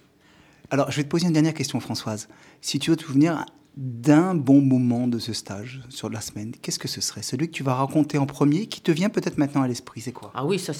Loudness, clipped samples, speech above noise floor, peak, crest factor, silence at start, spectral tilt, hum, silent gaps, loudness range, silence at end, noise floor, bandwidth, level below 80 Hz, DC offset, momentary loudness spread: -24 LUFS; under 0.1%; 32 dB; -4 dBFS; 20 dB; 0.7 s; -5.5 dB/octave; none; none; 5 LU; 0 s; -55 dBFS; 15.5 kHz; -64 dBFS; under 0.1%; 15 LU